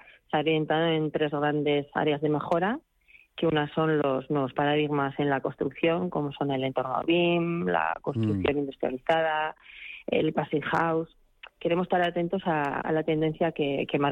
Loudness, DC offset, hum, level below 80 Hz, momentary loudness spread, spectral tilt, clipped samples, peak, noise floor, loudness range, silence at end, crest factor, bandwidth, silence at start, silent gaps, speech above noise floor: -27 LUFS; under 0.1%; none; -60 dBFS; 6 LU; -8 dB/octave; under 0.1%; -12 dBFS; -58 dBFS; 1 LU; 0 s; 16 dB; 7.6 kHz; 0.35 s; none; 32 dB